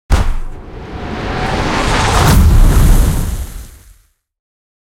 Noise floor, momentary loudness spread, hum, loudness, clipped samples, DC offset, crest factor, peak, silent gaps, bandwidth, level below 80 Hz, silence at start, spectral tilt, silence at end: -48 dBFS; 19 LU; none; -13 LUFS; under 0.1%; under 0.1%; 12 dB; 0 dBFS; none; 16 kHz; -14 dBFS; 0.1 s; -5 dB/octave; 1.1 s